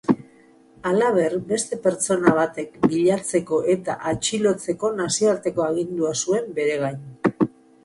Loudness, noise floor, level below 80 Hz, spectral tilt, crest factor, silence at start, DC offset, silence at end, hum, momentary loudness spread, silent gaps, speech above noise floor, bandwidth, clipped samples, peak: -22 LUFS; -52 dBFS; -58 dBFS; -4.5 dB/octave; 20 dB; 0.1 s; under 0.1%; 0.35 s; none; 7 LU; none; 31 dB; 11.5 kHz; under 0.1%; -2 dBFS